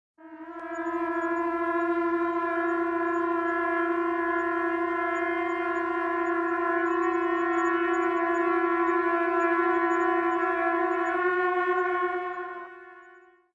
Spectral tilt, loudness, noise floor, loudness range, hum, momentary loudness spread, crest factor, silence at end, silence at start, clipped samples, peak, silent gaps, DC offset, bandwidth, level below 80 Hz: -5 dB/octave; -26 LUFS; -55 dBFS; 2 LU; none; 6 LU; 14 dB; 0.35 s; 0.2 s; under 0.1%; -14 dBFS; none; under 0.1%; 7.4 kHz; -66 dBFS